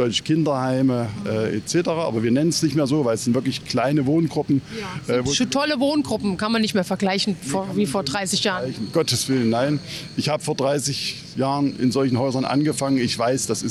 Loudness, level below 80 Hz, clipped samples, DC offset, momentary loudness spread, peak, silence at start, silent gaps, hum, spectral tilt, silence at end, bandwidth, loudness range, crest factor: -22 LUFS; -56 dBFS; under 0.1%; under 0.1%; 5 LU; -8 dBFS; 0 s; none; none; -5 dB/octave; 0 s; 13.5 kHz; 1 LU; 12 dB